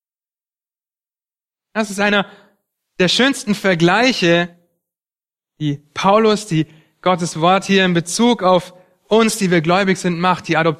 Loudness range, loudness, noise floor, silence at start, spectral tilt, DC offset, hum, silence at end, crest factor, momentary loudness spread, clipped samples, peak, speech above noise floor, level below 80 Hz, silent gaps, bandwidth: 4 LU; -16 LUFS; under -90 dBFS; 1.75 s; -4.5 dB/octave; under 0.1%; none; 0.05 s; 16 dB; 10 LU; under 0.1%; 0 dBFS; over 75 dB; -58 dBFS; none; 14.5 kHz